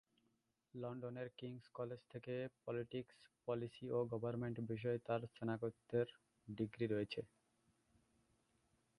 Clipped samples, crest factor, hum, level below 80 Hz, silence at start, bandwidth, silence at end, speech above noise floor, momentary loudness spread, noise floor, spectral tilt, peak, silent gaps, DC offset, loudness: under 0.1%; 20 dB; none; -78 dBFS; 0.75 s; 11 kHz; 1.75 s; 39 dB; 11 LU; -84 dBFS; -8.5 dB/octave; -28 dBFS; none; under 0.1%; -46 LUFS